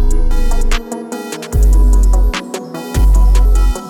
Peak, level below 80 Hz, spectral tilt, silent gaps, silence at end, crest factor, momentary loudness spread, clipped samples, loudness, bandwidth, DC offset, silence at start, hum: -2 dBFS; -10 dBFS; -5.5 dB/octave; none; 0 s; 8 dB; 12 LU; under 0.1%; -15 LUFS; 14.5 kHz; under 0.1%; 0 s; none